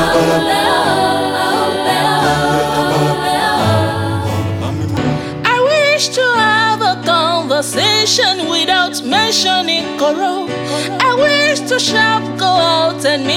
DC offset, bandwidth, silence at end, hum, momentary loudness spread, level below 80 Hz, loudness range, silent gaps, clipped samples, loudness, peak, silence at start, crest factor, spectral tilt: under 0.1%; 17.5 kHz; 0 s; none; 7 LU; -44 dBFS; 2 LU; none; under 0.1%; -13 LUFS; -2 dBFS; 0 s; 10 dB; -3.5 dB/octave